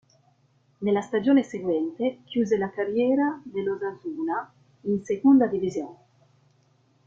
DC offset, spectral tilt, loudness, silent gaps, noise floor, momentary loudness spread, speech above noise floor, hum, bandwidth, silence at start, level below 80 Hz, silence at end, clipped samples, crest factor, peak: under 0.1%; -7 dB/octave; -25 LUFS; none; -64 dBFS; 12 LU; 40 dB; none; 7.4 kHz; 0.8 s; -68 dBFS; 1.15 s; under 0.1%; 16 dB; -10 dBFS